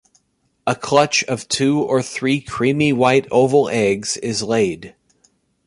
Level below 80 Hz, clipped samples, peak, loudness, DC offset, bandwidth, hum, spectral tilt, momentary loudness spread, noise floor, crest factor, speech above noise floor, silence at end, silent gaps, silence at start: -54 dBFS; under 0.1%; -2 dBFS; -18 LUFS; under 0.1%; 11.5 kHz; none; -4.5 dB/octave; 7 LU; -65 dBFS; 18 dB; 48 dB; 0.75 s; none; 0.65 s